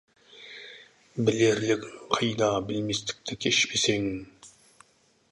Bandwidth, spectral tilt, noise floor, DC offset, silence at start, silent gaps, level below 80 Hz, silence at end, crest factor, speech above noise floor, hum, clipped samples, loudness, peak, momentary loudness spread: 11.5 kHz; -3.5 dB/octave; -65 dBFS; under 0.1%; 0.35 s; none; -60 dBFS; 0.8 s; 24 dB; 38 dB; none; under 0.1%; -26 LUFS; -6 dBFS; 20 LU